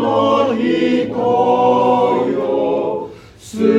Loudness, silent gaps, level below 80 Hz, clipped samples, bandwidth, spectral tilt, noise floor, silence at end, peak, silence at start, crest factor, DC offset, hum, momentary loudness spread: -15 LUFS; none; -54 dBFS; under 0.1%; 11 kHz; -6.5 dB/octave; -35 dBFS; 0 s; -2 dBFS; 0 s; 14 dB; under 0.1%; none; 9 LU